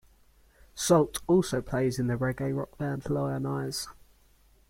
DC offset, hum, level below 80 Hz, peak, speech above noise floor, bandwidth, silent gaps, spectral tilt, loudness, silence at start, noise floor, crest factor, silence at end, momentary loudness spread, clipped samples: under 0.1%; none; -54 dBFS; -10 dBFS; 34 dB; 16.5 kHz; none; -5.5 dB/octave; -29 LUFS; 0.75 s; -61 dBFS; 20 dB; 0.8 s; 10 LU; under 0.1%